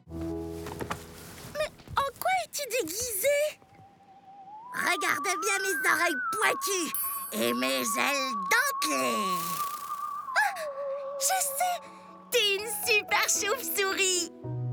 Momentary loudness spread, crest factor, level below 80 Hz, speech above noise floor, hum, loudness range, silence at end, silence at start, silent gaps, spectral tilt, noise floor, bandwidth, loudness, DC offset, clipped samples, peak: 12 LU; 18 dB; -62 dBFS; 27 dB; none; 4 LU; 0 s; 0.05 s; none; -2 dB/octave; -55 dBFS; over 20 kHz; -28 LUFS; under 0.1%; under 0.1%; -12 dBFS